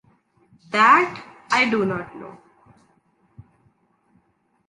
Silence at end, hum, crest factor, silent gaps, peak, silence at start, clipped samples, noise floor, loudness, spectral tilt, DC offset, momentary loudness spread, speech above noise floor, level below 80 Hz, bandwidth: 2.35 s; none; 22 dB; none; -4 dBFS; 0.7 s; under 0.1%; -66 dBFS; -19 LUFS; -4.5 dB/octave; under 0.1%; 25 LU; 47 dB; -64 dBFS; 11 kHz